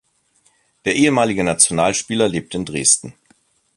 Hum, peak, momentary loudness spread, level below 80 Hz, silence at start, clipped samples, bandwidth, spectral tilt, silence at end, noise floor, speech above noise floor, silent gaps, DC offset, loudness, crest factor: none; 0 dBFS; 9 LU; -50 dBFS; 0.85 s; under 0.1%; 12 kHz; -3 dB/octave; 0.65 s; -60 dBFS; 43 dB; none; under 0.1%; -16 LUFS; 20 dB